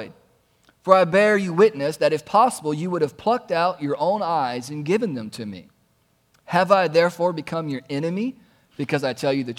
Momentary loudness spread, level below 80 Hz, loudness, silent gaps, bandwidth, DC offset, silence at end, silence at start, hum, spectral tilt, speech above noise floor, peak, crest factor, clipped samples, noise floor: 13 LU; -66 dBFS; -21 LUFS; none; 16 kHz; under 0.1%; 0.05 s; 0 s; none; -5.5 dB/octave; 43 dB; 0 dBFS; 22 dB; under 0.1%; -64 dBFS